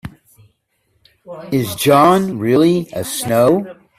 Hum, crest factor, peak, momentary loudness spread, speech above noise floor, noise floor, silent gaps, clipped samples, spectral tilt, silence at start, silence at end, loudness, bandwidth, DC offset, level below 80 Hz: none; 16 dB; 0 dBFS; 16 LU; 50 dB; -64 dBFS; none; under 0.1%; -5.5 dB/octave; 0.05 s; 0.25 s; -15 LUFS; 16 kHz; under 0.1%; -52 dBFS